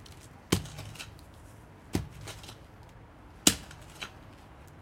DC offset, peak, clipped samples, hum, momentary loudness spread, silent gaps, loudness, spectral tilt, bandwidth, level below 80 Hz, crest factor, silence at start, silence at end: under 0.1%; -2 dBFS; under 0.1%; none; 27 LU; none; -32 LUFS; -2.5 dB/octave; 16.5 kHz; -52 dBFS; 36 dB; 0 s; 0 s